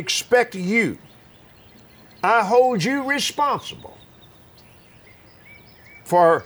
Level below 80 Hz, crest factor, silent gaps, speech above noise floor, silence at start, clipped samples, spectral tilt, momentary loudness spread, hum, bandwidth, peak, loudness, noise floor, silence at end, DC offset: -62 dBFS; 18 dB; none; 30 dB; 0 s; under 0.1%; -4 dB/octave; 18 LU; none; over 20 kHz; -4 dBFS; -19 LUFS; -49 dBFS; 0 s; under 0.1%